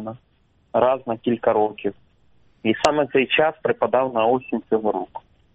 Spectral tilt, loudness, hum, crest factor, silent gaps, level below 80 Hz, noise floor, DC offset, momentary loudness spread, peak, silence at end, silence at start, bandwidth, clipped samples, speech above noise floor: -3 dB/octave; -21 LUFS; none; 22 dB; none; -58 dBFS; -59 dBFS; under 0.1%; 11 LU; 0 dBFS; 0.35 s; 0 s; 8 kHz; under 0.1%; 39 dB